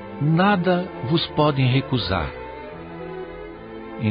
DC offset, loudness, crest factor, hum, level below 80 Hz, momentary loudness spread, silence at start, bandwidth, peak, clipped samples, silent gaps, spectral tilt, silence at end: under 0.1%; -21 LUFS; 16 dB; none; -42 dBFS; 18 LU; 0 s; 5.2 kHz; -6 dBFS; under 0.1%; none; -11.5 dB/octave; 0 s